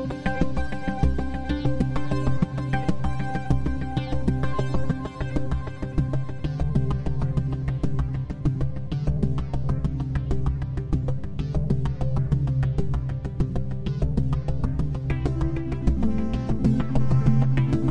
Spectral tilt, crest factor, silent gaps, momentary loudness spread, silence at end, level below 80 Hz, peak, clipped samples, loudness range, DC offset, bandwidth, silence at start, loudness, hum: -8.5 dB/octave; 18 dB; none; 6 LU; 0 s; -30 dBFS; -6 dBFS; under 0.1%; 2 LU; 2%; 8.4 kHz; 0 s; -26 LUFS; none